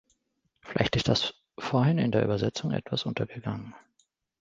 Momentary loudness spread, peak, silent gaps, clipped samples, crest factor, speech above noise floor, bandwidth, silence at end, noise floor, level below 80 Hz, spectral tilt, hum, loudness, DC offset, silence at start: 12 LU; -6 dBFS; none; under 0.1%; 24 dB; 49 dB; 7.8 kHz; 0.65 s; -76 dBFS; -54 dBFS; -6 dB/octave; none; -28 LUFS; under 0.1%; 0.65 s